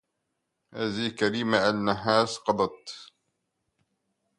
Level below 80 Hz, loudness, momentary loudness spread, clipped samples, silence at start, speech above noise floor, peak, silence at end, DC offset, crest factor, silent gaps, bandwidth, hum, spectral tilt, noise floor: -64 dBFS; -26 LUFS; 18 LU; under 0.1%; 0.75 s; 54 dB; -6 dBFS; 1.35 s; under 0.1%; 24 dB; none; 11.5 kHz; none; -4.5 dB/octave; -80 dBFS